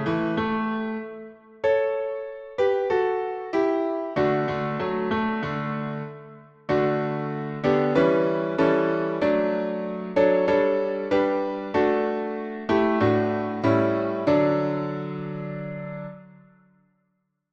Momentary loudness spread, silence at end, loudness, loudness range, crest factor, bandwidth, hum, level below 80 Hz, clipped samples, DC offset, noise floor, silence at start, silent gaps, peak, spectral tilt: 12 LU; 1.25 s; -24 LUFS; 4 LU; 16 dB; 7.2 kHz; none; -58 dBFS; under 0.1%; under 0.1%; -74 dBFS; 0 s; none; -8 dBFS; -8 dB/octave